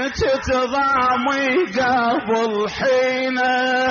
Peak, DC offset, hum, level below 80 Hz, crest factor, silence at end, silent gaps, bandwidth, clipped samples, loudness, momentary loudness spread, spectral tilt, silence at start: -8 dBFS; under 0.1%; none; -44 dBFS; 10 dB; 0 s; none; 7.2 kHz; under 0.1%; -18 LUFS; 3 LU; -2 dB/octave; 0 s